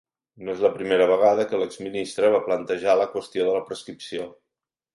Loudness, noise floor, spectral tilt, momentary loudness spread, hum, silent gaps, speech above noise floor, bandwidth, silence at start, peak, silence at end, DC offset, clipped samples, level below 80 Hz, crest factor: -23 LUFS; -85 dBFS; -4.5 dB/octave; 15 LU; none; none; 63 dB; 11.5 kHz; 0.4 s; -6 dBFS; 0.65 s; under 0.1%; under 0.1%; -66 dBFS; 18 dB